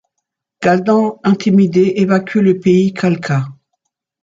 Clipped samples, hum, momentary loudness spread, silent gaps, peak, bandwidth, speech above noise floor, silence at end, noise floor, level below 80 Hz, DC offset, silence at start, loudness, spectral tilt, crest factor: under 0.1%; none; 7 LU; none; -2 dBFS; 7.6 kHz; 63 dB; 0.7 s; -76 dBFS; -56 dBFS; under 0.1%; 0.6 s; -14 LUFS; -7.5 dB/octave; 12 dB